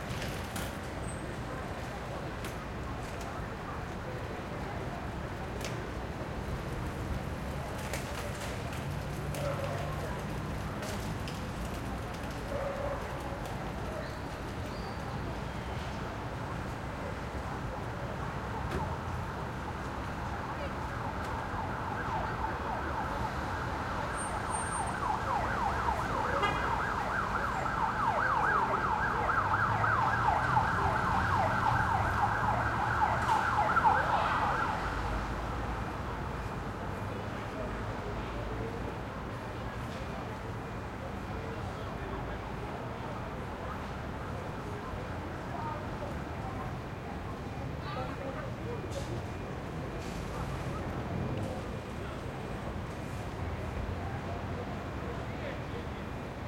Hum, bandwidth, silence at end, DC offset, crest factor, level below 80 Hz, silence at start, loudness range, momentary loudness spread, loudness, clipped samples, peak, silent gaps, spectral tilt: none; 16.5 kHz; 0 s; under 0.1%; 20 dB; -46 dBFS; 0 s; 10 LU; 10 LU; -35 LUFS; under 0.1%; -14 dBFS; none; -5.5 dB/octave